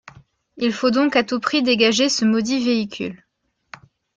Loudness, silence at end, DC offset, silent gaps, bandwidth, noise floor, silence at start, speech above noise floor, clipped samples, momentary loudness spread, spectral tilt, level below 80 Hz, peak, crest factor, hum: -19 LUFS; 1 s; under 0.1%; none; 9.2 kHz; -47 dBFS; 0.55 s; 28 dB; under 0.1%; 9 LU; -3.5 dB/octave; -62 dBFS; -4 dBFS; 18 dB; none